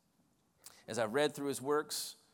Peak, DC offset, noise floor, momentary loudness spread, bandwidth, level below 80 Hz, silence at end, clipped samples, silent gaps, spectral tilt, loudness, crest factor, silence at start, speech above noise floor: -20 dBFS; under 0.1%; -74 dBFS; 8 LU; 19 kHz; -84 dBFS; 0.2 s; under 0.1%; none; -3.5 dB/octave; -36 LUFS; 18 dB; 0.65 s; 39 dB